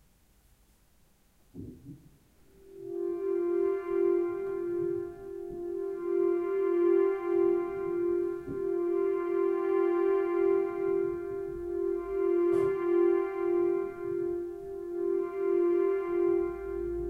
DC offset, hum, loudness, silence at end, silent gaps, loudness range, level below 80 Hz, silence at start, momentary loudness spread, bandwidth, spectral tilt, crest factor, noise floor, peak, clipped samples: under 0.1%; none; -30 LUFS; 0 s; none; 4 LU; -58 dBFS; 1.55 s; 10 LU; 3.3 kHz; -8.5 dB/octave; 12 dB; -64 dBFS; -18 dBFS; under 0.1%